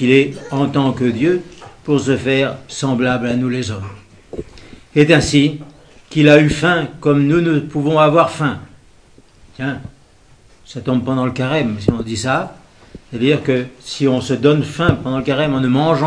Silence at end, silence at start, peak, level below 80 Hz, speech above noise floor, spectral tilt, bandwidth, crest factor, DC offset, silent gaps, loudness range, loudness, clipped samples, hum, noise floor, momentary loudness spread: 0 s; 0 s; 0 dBFS; -42 dBFS; 33 dB; -6 dB/octave; 10.5 kHz; 16 dB; under 0.1%; none; 7 LU; -16 LUFS; under 0.1%; none; -47 dBFS; 18 LU